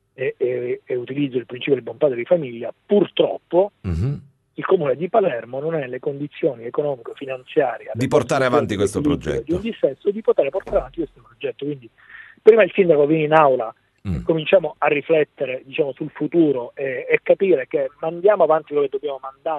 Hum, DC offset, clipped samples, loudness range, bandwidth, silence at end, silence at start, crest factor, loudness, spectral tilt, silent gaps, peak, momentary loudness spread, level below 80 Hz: none; under 0.1%; under 0.1%; 5 LU; 12 kHz; 0 s; 0.2 s; 20 dB; -20 LUFS; -6.5 dB/octave; none; 0 dBFS; 13 LU; -46 dBFS